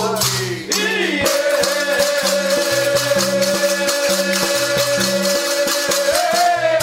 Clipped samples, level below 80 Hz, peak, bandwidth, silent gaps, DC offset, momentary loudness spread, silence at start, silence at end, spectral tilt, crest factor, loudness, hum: under 0.1%; -52 dBFS; -2 dBFS; 16.5 kHz; none; under 0.1%; 2 LU; 0 s; 0 s; -2 dB/octave; 14 dB; -16 LUFS; none